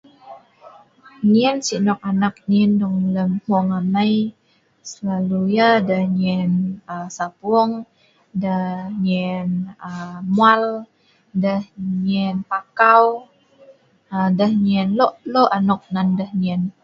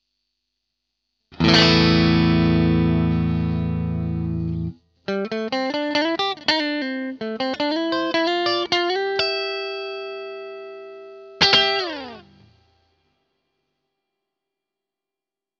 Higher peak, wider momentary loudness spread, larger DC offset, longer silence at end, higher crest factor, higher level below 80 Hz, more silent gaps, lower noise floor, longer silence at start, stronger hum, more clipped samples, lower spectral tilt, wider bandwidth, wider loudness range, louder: about the same, 0 dBFS vs -2 dBFS; second, 13 LU vs 18 LU; neither; second, 0.1 s vs 3.4 s; about the same, 18 dB vs 22 dB; second, -60 dBFS vs -42 dBFS; neither; second, -50 dBFS vs -88 dBFS; second, 0.25 s vs 1.3 s; neither; neither; about the same, -6.5 dB/octave vs -5.5 dB/octave; about the same, 7.6 kHz vs 7.6 kHz; about the same, 4 LU vs 6 LU; about the same, -19 LUFS vs -20 LUFS